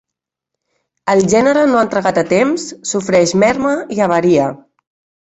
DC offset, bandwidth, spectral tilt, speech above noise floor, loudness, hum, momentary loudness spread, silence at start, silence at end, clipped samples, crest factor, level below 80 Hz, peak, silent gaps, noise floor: under 0.1%; 8.4 kHz; -5 dB/octave; 69 dB; -14 LUFS; none; 9 LU; 1.05 s; 0.7 s; under 0.1%; 14 dB; -52 dBFS; -2 dBFS; none; -82 dBFS